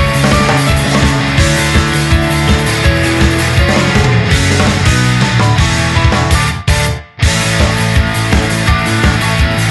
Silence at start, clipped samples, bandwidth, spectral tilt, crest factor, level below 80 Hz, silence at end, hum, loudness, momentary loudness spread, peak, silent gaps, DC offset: 0 s; under 0.1%; 12.5 kHz; -4.5 dB/octave; 10 dB; -18 dBFS; 0 s; none; -11 LUFS; 2 LU; 0 dBFS; none; under 0.1%